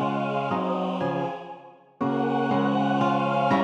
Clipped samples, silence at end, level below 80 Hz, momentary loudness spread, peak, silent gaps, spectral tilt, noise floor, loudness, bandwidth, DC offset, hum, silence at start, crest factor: under 0.1%; 0 s; -72 dBFS; 9 LU; -12 dBFS; none; -7.5 dB/octave; -45 dBFS; -25 LUFS; 8.6 kHz; under 0.1%; none; 0 s; 14 dB